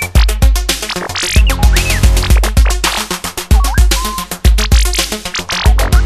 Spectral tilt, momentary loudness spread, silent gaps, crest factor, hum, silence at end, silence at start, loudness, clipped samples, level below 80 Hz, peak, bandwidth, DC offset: -3.5 dB/octave; 6 LU; none; 10 dB; none; 0 s; 0 s; -13 LUFS; under 0.1%; -12 dBFS; 0 dBFS; 14.5 kHz; under 0.1%